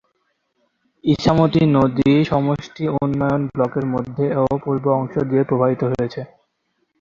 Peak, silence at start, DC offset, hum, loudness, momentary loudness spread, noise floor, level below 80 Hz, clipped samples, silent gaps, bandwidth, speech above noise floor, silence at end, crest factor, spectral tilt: -2 dBFS; 1.05 s; under 0.1%; none; -19 LUFS; 8 LU; -70 dBFS; -46 dBFS; under 0.1%; none; 7.4 kHz; 52 dB; 0.75 s; 18 dB; -8.5 dB/octave